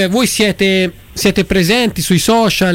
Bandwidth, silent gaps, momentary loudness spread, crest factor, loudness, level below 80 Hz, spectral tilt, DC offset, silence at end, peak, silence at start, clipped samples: 17 kHz; none; 4 LU; 10 dB; -13 LUFS; -36 dBFS; -4 dB/octave; under 0.1%; 0 s; -2 dBFS; 0 s; under 0.1%